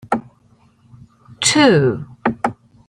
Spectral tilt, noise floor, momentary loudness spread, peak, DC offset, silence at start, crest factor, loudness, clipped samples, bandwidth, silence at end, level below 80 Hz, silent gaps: -4 dB/octave; -54 dBFS; 12 LU; 0 dBFS; under 0.1%; 0.1 s; 18 dB; -16 LUFS; under 0.1%; 16 kHz; 0.35 s; -54 dBFS; none